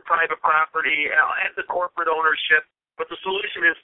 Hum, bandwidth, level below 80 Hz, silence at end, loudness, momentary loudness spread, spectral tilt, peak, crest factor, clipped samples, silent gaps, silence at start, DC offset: none; 4.1 kHz; -64 dBFS; 0.05 s; -20 LUFS; 8 LU; -6.5 dB/octave; -6 dBFS; 16 dB; under 0.1%; none; 0.05 s; under 0.1%